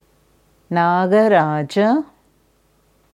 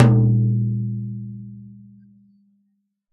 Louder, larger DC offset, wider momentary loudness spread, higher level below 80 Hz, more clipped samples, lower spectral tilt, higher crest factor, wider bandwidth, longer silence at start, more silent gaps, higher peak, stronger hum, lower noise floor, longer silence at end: first, -17 LUFS vs -20 LUFS; neither; second, 9 LU vs 24 LU; second, -64 dBFS vs -52 dBFS; neither; second, -7.5 dB/octave vs -9.5 dB/octave; about the same, 16 dB vs 20 dB; first, 12 kHz vs 3.9 kHz; first, 0.7 s vs 0 s; neither; second, -4 dBFS vs 0 dBFS; neither; second, -59 dBFS vs -70 dBFS; second, 1.1 s vs 1.4 s